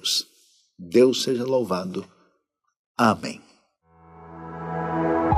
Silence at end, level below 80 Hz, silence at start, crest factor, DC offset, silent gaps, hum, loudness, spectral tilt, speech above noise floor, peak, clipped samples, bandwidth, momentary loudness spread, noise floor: 0 s; -62 dBFS; 0.05 s; 20 dB; under 0.1%; 2.79-2.95 s; none; -23 LUFS; -4.5 dB/octave; 51 dB; -4 dBFS; under 0.1%; 15.5 kHz; 23 LU; -73 dBFS